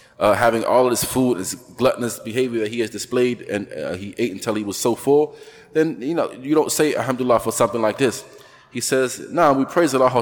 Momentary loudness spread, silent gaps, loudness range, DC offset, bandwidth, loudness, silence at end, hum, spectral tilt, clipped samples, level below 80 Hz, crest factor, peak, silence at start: 9 LU; none; 3 LU; under 0.1%; 19 kHz; -20 LUFS; 0 s; none; -4.5 dB/octave; under 0.1%; -56 dBFS; 16 dB; -4 dBFS; 0.2 s